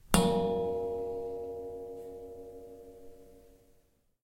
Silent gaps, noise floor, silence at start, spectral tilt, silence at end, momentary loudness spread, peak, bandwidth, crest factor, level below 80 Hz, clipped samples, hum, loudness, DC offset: none; -68 dBFS; 0.05 s; -5 dB/octave; 0.75 s; 23 LU; -4 dBFS; 16.5 kHz; 30 dB; -50 dBFS; under 0.1%; none; -34 LUFS; under 0.1%